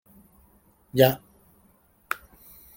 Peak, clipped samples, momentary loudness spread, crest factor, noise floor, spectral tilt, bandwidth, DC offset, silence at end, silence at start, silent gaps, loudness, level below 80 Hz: -4 dBFS; under 0.1%; 16 LU; 26 dB; -61 dBFS; -5.5 dB/octave; 17 kHz; under 0.1%; 1.6 s; 0.95 s; none; -25 LUFS; -60 dBFS